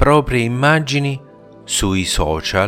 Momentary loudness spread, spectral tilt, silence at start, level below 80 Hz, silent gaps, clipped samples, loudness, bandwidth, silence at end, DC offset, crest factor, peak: 7 LU; -4.5 dB/octave; 0 s; -30 dBFS; none; under 0.1%; -17 LUFS; 16.5 kHz; 0 s; under 0.1%; 16 dB; 0 dBFS